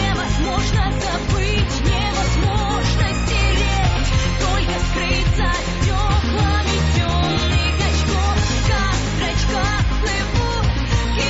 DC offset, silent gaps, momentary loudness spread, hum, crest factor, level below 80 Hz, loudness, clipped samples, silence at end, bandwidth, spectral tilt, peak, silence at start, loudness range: under 0.1%; none; 2 LU; none; 12 dB; -22 dBFS; -19 LUFS; under 0.1%; 0 s; 8 kHz; -4.5 dB/octave; -6 dBFS; 0 s; 1 LU